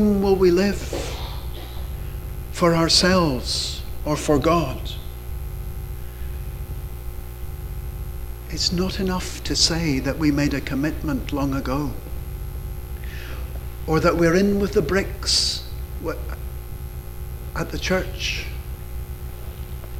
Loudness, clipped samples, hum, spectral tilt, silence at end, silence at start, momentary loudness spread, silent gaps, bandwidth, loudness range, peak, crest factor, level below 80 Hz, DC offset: -23 LUFS; under 0.1%; 60 Hz at -35 dBFS; -4.5 dB/octave; 0 s; 0 s; 17 LU; none; 16.5 kHz; 8 LU; -4 dBFS; 20 dB; -32 dBFS; under 0.1%